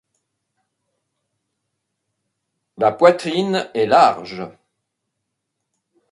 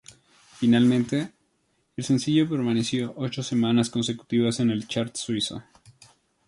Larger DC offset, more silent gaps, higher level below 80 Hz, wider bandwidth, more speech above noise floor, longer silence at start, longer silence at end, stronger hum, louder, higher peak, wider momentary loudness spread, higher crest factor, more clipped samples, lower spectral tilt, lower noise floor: neither; neither; about the same, -66 dBFS vs -62 dBFS; about the same, 11.5 kHz vs 11.5 kHz; first, 61 dB vs 47 dB; first, 2.8 s vs 0.6 s; first, 1.65 s vs 0.85 s; neither; first, -16 LUFS vs -25 LUFS; first, 0 dBFS vs -8 dBFS; first, 18 LU vs 10 LU; first, 22 dB vs 16 dB; neither; about the same, -5.5 dB/octave vs -5.5 dB/octave; first, -77 dBFS vs -70 dBFS